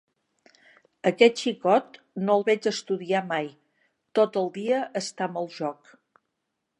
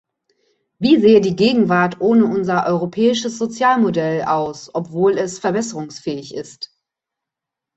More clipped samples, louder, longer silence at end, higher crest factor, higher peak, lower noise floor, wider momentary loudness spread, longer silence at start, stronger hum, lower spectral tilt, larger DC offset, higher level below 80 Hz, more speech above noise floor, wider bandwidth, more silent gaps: neither; second, -25 LUFS vs -17 LUFS; about the same, 1.05 s vs 1.1 s; first, 24 dB vs 16 dB; about the same, -2 dBFS vs -2 dBFS; about the same, -81 dBFS vs -84 dBFS; second, 11 LU vs 14 LU; first, 1.05 s vs 0.8 s; neither; about the same, -4.5 dB/octave vs -5.5 dB/octave; neither; second, -80 dBFS vs -58 dBFS; second, 56 dB vs 68 dB; first, 11 kHz vs 8.2 kHz; neither